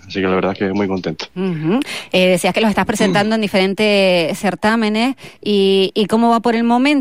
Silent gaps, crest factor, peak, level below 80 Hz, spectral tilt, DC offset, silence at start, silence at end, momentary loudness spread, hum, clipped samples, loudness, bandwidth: none; 12 dB; -4 dBFS; -52 dBFS; -5 dB/octave; 0.5%; 0.05 s; 0 s; 7 LU; none; under 0.1%; -16 LUFS; 16 kHz